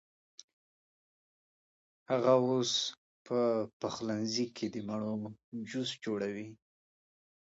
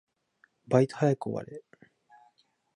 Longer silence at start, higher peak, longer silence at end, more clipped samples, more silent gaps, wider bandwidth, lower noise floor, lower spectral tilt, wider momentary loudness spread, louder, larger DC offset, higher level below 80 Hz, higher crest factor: first, 2.1 s vs 0.7 s; second, -14 dBFS vs -8 dBFS; second, 0.95 s vs 1.15 s; neither; first, 2.98-3.25 s, 3.73-3.80 s, 5.44-5.52 s vs none; second, 8 kHz vs 10.5 kHz; first, under -90 dBFS vs -68 dBFS; second, -4.5 dB/octave vs -8 dB/octave; second, 13 LU vs 20 LU; second, -34 LUFS vs -28 LUFS; neither; about the same, -78 dBFS vs -74 dBFS; about the same, 22 dB vs 22 dB